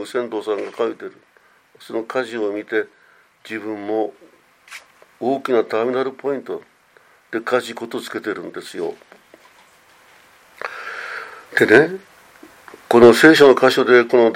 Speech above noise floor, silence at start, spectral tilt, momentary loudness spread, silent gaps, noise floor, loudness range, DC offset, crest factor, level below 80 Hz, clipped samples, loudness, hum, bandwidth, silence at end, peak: 36 dB; 0 s; -5 dB/octave; 21 LU; none; -53 dBFS; 14 LU; under 0.1%; 18 dB; -64 dBFS; under 0.1%; -17 LUFS; none; 16 kHz; 0 s; 0 dBFS